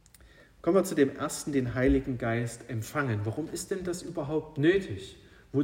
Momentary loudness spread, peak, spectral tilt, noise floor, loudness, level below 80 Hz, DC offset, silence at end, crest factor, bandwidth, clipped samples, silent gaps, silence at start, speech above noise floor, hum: 9 LU; -10 dBFS; -6 dB/octave; -56 dBFS; -30 LUFS; -48 dBFS; under 0.1%; 0 s; 18 dB; 16 kHz; under 0.1%; none; 0.25 s; 27 dB; none